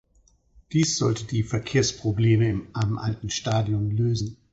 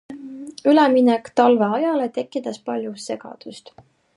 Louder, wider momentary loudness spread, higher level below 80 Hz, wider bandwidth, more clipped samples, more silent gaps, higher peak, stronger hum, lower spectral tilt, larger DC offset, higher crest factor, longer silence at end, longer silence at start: second, -25 LUFS vs -19 LUFS; second, 7 LU vs 21 LU; first, -48 dBFS vs -72 dBFS; second, 8 kHz vs 11.5 kHz; neither; neither; second, -8 dBFS vs -2 dBFS; neither; about the same, -5.5 dB/octave vs -5.5 dB/octave; neither; about the same, 16 dB vs 18 dB; second, 0.2 s vs 0.6 s; first, 0.7 s vs 0.1 s